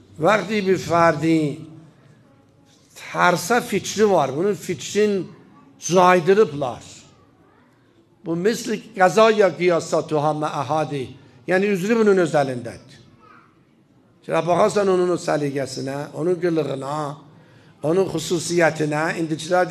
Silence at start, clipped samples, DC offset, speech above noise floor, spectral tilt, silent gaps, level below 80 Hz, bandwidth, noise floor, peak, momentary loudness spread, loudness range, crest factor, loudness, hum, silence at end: 0.2 s; under 0.1%; under 0.1%; 36 dB; -5 dB/octave; none; -62 dBFS; 14 kHz; -56 dBFS; 0 dBFS; 13 LU; 3 LU; 20 dB; -20 LUFS; none; 0 s